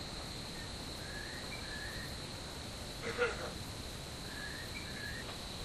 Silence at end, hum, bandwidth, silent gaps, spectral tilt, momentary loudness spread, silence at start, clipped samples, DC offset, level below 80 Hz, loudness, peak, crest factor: 0 s; none; 15.5 kHz; none; -3.5 dB/octave; 7 LU; 0 s; under 0.1%; under 0.1%; -52 dBFS; -42 LUFS; -20 dBFS; 22 dB